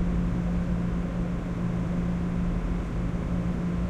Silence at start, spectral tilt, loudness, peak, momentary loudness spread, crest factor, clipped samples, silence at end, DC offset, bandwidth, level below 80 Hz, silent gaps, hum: 0 s; -8.5 dB/octave; -29 LUFS; -16 dBFS; 2 LU; 12 dB; under 0.1%; 0 s; under 0.1%; 8.2 kHz; -32 dBFS; none; none